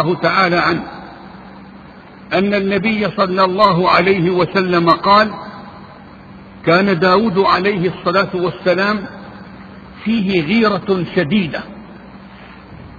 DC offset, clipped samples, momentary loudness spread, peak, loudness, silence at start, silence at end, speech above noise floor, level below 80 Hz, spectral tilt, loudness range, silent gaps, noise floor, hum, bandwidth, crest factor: under 0.1%; under 0.1%; 22 LU; 0 dBFS; -15 LUFS; 0 s; 0 s; 24 dB; -48 dBFS; -7.5 dB/octave; 5 LU; none; -38 dBFS; none; 7 kHz; 16 dB